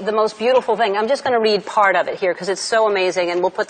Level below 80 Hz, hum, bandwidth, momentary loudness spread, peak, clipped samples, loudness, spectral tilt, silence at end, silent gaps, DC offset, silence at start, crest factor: -64 dBFS; none; 9.4 kHz; 5 LU; -4 dBFS; under 0.1%; -18 LUFS; -3.5 dB/octave; 0.05 s; none; under 0.1%; 0 s; 14 dB